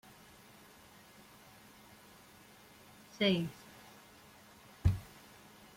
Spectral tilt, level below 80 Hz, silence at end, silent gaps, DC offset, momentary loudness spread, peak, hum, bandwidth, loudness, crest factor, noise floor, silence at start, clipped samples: -6 dB/octave; -52 dBFS; 0.7 s; none; under 0.1%; 24 LU; -16 dBFS; none; 16.5 kHz; -35 LUFS; 24 dB; -59 dBFS; 3.15 s; under 0.1%